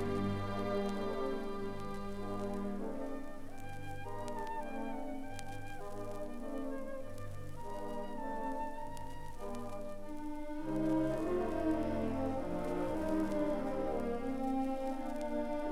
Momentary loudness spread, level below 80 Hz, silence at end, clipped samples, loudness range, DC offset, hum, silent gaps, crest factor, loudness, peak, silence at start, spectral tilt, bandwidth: 11 LU; -48 dBFS; 0 s; under 0.1%; 8 LU; under 0.1%; none; none; 14 dB; -40 LUFS; -22 dBFS; 0 s; -7 dB/octave; 13.5 kHz